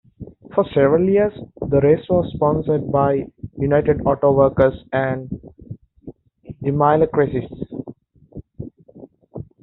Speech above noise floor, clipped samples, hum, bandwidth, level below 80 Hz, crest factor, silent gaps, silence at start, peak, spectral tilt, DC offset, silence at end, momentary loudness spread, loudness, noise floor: 27 dB; under 0.1%; none; 4.1 kHz; -44 dBFS; 18 dB; none; 0.2 s; -2 dBFS; -8 dB/octave; under 0.1%; 0.2 s; 22 LU; -18 LUFS; -44 dBFS